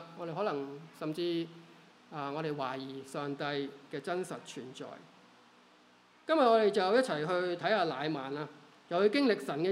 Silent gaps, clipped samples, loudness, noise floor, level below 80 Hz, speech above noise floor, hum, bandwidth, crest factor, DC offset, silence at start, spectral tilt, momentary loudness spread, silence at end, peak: none; under 0.1%; -33 LUFS; -63 dBFS; -88 dBFS; 30 dB; none; 14 kHz; 20 dB; under 0.1%; 0 s; -5.5 dB/octave; 17 LU; 0 s; -14 dBFS